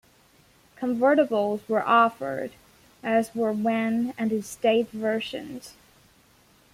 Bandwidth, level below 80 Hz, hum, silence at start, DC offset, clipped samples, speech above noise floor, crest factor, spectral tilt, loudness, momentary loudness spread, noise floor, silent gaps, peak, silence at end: 15.5 kHz; -66 dBFS; none; 0.8 s; under 0.1%; under 0.1%; 34 dB; 18 dB; -5.5 dB/octave; -25 LUFS; 14 LU; -59 dBFS; none; -8 dBFS; 1.05 s